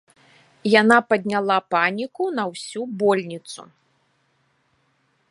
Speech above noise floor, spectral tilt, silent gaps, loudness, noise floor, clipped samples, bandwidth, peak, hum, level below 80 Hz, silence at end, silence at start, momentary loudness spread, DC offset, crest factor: 46 dB; -4.5 dB/octave; none; -20 LUFS; -66 dBFS; under 0.1%; 11.5 kHz; 0 dBFS; none; -70 dBFS; 1.7 s; 0.65 s; 17 LU; under 0.1%; 22 dB